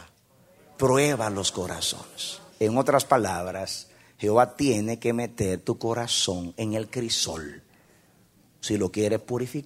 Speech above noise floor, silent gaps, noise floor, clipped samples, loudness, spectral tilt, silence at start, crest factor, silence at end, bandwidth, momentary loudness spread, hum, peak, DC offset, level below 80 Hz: 34 dB; none; -60 dBFS; under 0.1%; -26 LUFS; -4 dB/octave; 0 s; 22 dB; 0 s; 16 kHz; 11 LU; none; -4 dBFS; under 0.1%; -58 dBFS